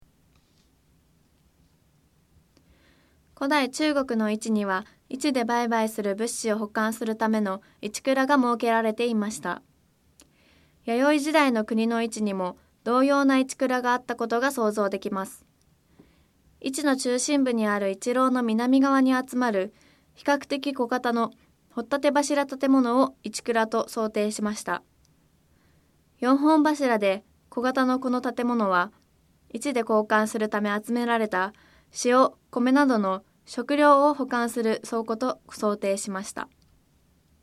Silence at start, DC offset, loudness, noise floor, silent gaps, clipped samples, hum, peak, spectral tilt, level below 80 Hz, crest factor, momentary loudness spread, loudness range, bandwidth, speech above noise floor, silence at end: 3.4 s; under 0.1%; -25 LUFS; -64 dBFS; none; under 0.1%; none; -6 dBFS; -4 dB/octave; -68 dBFS; 20 dB; 12 LU; 5 LU; 15 kHz; 39 dB; 0.95 s